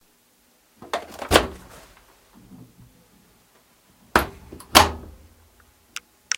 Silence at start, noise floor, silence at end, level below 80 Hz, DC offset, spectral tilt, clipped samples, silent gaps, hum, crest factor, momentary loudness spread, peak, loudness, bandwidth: 0.8 s; -60 dBFS; 1.35 s; -42 dBFS; under 0.1%; -2.5 dB/octave; under 0.1%; none; none; 26 dB; 23 LU; 0 dBFS; -21 LUFS; 17 kHz